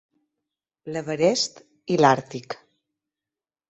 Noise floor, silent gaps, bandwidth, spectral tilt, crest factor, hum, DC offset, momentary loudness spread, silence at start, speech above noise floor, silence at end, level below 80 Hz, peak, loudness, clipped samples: under -90 dBFS; none; 8.2 kHz; -4.5 dB/octave; 22 dB; none; under 0.1%; 20 LU; 0.85 s; over 68 dB; 1.15 s; -68 dBFS; -4 dBFS; -22 LUFS; under 0.1%